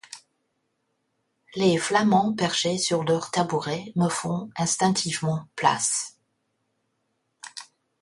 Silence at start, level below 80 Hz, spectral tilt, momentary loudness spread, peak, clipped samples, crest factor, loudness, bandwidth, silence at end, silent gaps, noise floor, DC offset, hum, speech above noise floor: 0.1 s; -66 dBFS; -4 dB/octave; 19 LU; -6 dBFS; under 0.1%; 20 dB; -24 LUFS; 11.5 kHz; 0.4 s; none; -75 dBFS; under 0.1%; none; 51 dB